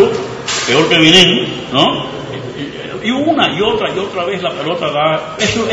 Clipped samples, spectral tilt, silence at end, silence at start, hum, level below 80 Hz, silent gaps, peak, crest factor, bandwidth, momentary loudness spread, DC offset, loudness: 0.2%; -3.5 dB/octave; 0 s; 0 s; none; -44 dBFS; none; 0 dBFS; 14 dB; 12 kHz; 17 LU; under 0.1%; -12 LUFS